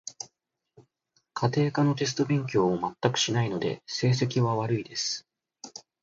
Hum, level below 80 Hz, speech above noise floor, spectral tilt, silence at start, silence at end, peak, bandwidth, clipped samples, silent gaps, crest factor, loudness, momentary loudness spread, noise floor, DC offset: none; -64 dBFS; 51 dB; -5 dB/octave; 0.05 s; 0.2 s; -8 dBFS; 7.8 kHz; under 0.1%; none; 20 dB; -27 LUFS; 17 LU; -77 dBFS; under 0.1%